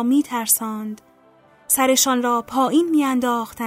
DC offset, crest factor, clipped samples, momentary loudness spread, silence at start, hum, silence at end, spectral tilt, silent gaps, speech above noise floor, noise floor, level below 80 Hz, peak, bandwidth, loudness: under 0.1%; 16 dB; under 0.1%; 12 LU; 0 s; none; 0 s; -2 dB/octave; none; 34 dB; -53 dBFS; -62 dBFS; -4 dBFS; 16 kHz; -19 LUFS